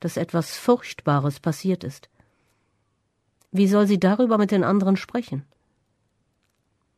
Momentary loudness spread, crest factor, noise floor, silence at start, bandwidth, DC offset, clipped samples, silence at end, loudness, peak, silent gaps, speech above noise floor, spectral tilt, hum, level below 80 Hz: 10 LU; 16 dB; -71 dBFS; 0 s; 13.5 kHz; under 0.1%; under 0.1%; 1.55 s; -22 LUFS; -8 dBFS; none; 50 dB; -7 dB/octave; none; -64 dBFS